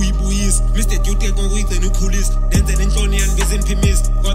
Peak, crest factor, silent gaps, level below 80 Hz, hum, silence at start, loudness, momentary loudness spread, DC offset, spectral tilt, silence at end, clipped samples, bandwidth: -2 dBFS; 12 dB; none; -14 dBFS; none; 0 s; -18 LUFS; 3 LU; under 0.1%; -4.5 dB/octave; 0 s; under 0.1%; 15.5 kHz